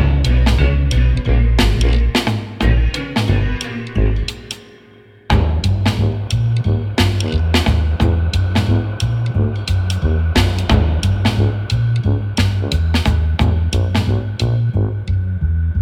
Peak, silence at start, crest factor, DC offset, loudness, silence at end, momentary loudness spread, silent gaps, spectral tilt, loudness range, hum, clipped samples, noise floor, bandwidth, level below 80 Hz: 0 dBFS; 0 s; 16 dB; under 0.1%; -17 LUFS; 0 s; 4 LU; none; -6 dB/octave; 3 LU; none; under 0.1%; -44 dBFS; 14 kHz; -20 dBFS